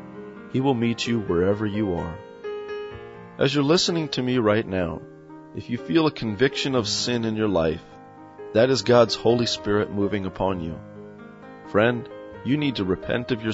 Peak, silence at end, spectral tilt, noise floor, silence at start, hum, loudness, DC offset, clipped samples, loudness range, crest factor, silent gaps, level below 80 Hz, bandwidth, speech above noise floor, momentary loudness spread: -4 dBFS; 0 s; -5.5 dB/octave; -43 dBFS; 0 s; none; -23 LUFS; under 0.1%; under 0.1%; 4 LU; 20 dB; none; -50 dBFS; 8 kHz; 20 dB; 19 LU